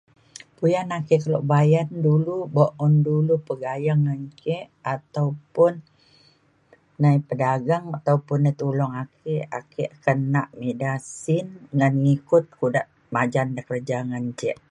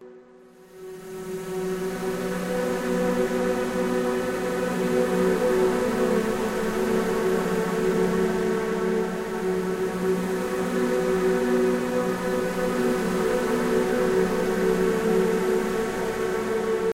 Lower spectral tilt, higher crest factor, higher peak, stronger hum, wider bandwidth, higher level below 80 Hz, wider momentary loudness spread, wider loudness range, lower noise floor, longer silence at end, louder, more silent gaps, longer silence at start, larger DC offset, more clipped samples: first, -8 dB/octave vs -5.5 dB/octave; about the same, 18 dB vs 14 dB; first, -4 dBFS vs -10 dBFS; neither; second, 10.5 kHz vs 16 kHz; second, -66 dBFS vs -48 dBFS; first, 10 LU vs 6 LU; about the same, 4 LU vs 3 LU; first, -60 dBFS vs -50 dBFS; first, 0.15 s vs 0 s; about the same, -23 LUFS vs -25 LUFS; neither; first, 0.6 s vs 0 s; neither; neither